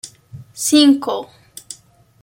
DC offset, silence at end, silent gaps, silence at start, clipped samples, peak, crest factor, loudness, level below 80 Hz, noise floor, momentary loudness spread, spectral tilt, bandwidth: under 0.1%; 0.5 s; none; 0.05 s; under 0.1%; 0 dBFS; 18 dB; -15 LUFS; -62 dBFS; -46 dBFS; 24 LU; -2.5 dB/octave; 16.5 kHz